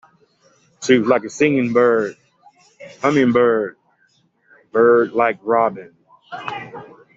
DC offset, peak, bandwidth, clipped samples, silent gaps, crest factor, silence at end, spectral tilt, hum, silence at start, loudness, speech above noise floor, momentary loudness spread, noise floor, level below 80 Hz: under 0.1%; -2 dBFS; 8 kHz; under 0.1%; none; 18 dB; 0.3 s; -5.5 dB/octave; none; 0.8 s; -17 LUFS; 45 dB; 17 LU; -61 dBFS; -64 dBFS